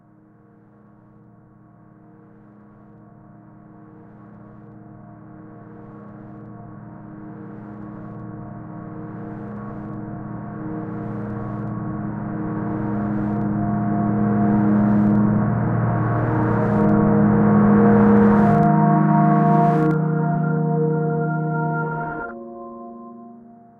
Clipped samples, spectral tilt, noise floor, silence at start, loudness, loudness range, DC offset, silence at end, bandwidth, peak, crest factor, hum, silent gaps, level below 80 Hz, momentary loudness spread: under 0.1%; -12 dB/octave; -51 dBFS; 3.8 s; -19 LUFS; 22 LU; under 0.1%; 0.4 s; 2.9 kHz; -4 dBFS; 16 dB; none; none; -46 dBFS; 24 LU